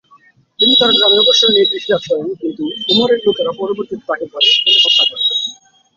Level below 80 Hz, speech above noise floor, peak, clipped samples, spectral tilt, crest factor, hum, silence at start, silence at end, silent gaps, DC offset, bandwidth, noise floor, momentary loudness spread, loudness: -58 dBFS; 36 dB; 0 dBFS; under 0.1%; -2.5 dB/octave; 14 dB; none; 0.6 s; 0.45 s; none; under 0.1%; 7.6 kHz; -49 dBFS; 13 LU; -11 LUFS